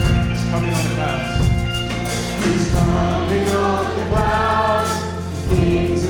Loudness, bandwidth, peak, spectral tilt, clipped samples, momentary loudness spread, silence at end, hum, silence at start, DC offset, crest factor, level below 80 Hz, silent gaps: -19 LUFS; 17.5 kHz; -2 dBFS; -6 dB/octave; under 0.1%; 5 LU; 0 s; none; 0 s; under 0.1%; 16 dB; -28 dBFS; none